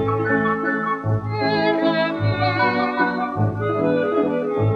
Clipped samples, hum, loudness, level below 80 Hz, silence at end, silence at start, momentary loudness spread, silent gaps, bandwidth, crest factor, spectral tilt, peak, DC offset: under 0.1%; none; -20 LUFS; -50 dBFS; 0 s; 0 s; 3 LU; none; 5.6 kHz; 14 dB; -8.5 dB/octave; -6 dBFS; under 0.1%